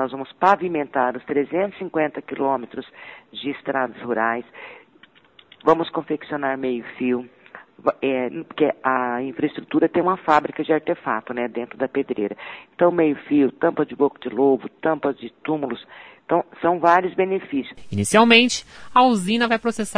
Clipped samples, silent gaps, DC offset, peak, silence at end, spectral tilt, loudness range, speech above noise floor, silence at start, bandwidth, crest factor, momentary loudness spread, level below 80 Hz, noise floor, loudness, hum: under 0.1%; none; under 0.1%; 0 dBFS; 0 s; -4.5 dB/octave; 7 LU; 32 dB; 0 s; 11 kHz; 22 dB; 12 LU; -62 dBFS; -53 dBFS; -21 LUFS; none